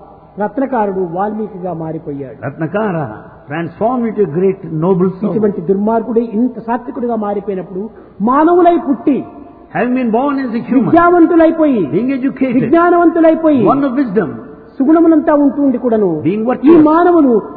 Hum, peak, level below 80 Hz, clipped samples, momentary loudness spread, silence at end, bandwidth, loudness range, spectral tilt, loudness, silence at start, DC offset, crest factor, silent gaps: none; 0 dBFS; -48 dBFS; under 0.1%; 14 LU; 0 s; 4.5 kHz; 8 LU; -12 dB/octave; -13 LUFS; 0 s; under 0.1%; 12 dB; none